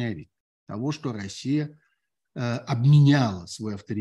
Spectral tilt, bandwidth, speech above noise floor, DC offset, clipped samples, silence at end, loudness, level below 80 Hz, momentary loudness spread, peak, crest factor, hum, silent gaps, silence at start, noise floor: -7 dB/octave; 9.4 kHz; 52 dB; under 0.1%; under 0.1%; 0 s; -24 LUFS; -64 dBFS; 19 LU; -8 dBFS; 16 dB; none; 0.40-0.67 s; 0 s; -75 dBFS